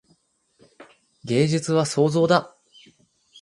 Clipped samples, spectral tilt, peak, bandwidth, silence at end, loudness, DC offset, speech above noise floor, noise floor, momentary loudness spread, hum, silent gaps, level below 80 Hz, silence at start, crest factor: under 0.1%; -6 dB/octave; -2 dBFS; 11.5 kHz; 0.95 s; -21 LUFS; under 0.1%; 44 dB; -64 dBFS; 5 LU; none; none; -64 dBFS; 0.8 s; 22 dB